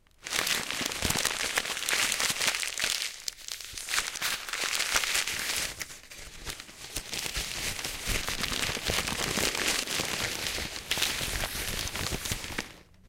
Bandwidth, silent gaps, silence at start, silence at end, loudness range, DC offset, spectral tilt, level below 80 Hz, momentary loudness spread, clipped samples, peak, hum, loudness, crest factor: 17 kHz; none; 0.2 s; 0 s; 4 LU; under 0.1%; -1 dB/octave; -46 dBFS; 12 LU; under 0.1%; -8 dBFS; none; -29 LUFS; 24 dB